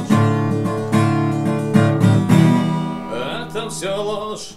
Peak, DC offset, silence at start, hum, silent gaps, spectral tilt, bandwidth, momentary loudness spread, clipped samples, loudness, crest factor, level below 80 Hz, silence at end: 0 dBFS; under 0.1%; 0 s; none; none; -7 dB/octave; 14 kHz; 11 LU; under 0.1%; -18 LUFS; 16 dB; -52 dBFS; 0 s